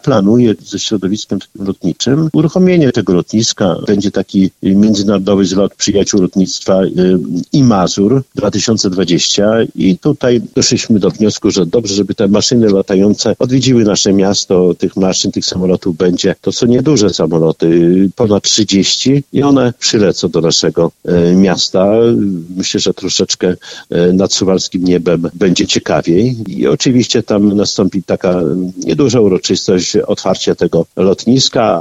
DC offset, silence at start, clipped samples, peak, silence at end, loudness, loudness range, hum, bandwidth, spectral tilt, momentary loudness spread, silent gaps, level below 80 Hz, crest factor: under 0.1%; 0.05 s; under 0.1%; 0 dBFS; 0 s; -11 LUFS; 2 LU; none; 8.2 kHz; -5 dB/octave; 5 LU; none; -42 dBFS; 10 dB